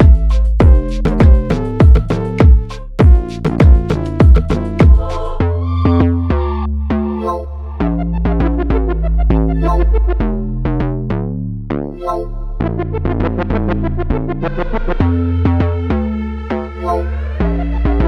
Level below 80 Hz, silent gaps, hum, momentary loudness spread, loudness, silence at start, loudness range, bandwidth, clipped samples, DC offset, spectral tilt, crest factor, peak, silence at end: -14 dBFS; none; none; 10 LU; -15 LUFS; 0 s; 7 LU; 6 kHz; under 0.1%; under 0.1%; -9.5 dB/octave; 12 dB; 0 dBFS; 0 s